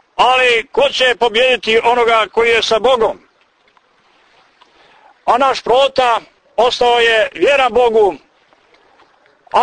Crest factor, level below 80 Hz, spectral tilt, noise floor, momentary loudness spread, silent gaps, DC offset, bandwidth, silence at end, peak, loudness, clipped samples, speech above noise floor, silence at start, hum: 14 dB; -48 dBFS; -2 dB/octave; -55 dBFS; 6 LU; none; under 0.1%; 9.6 kHz; 0 s; -2 dBFS; -13 LUFS; under 0.1%; 43 dB; 0.2 s; none